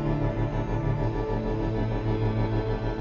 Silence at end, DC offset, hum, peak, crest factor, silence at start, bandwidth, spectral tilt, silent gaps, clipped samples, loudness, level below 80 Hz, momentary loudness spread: 0 s; under 0.1%; none; -14 dBFS; 12 dB; 0 s; 6.8 kHz; -9 dB/octave; none; under 0.1%; -28 LUFS; -34 dBFS; 2 LU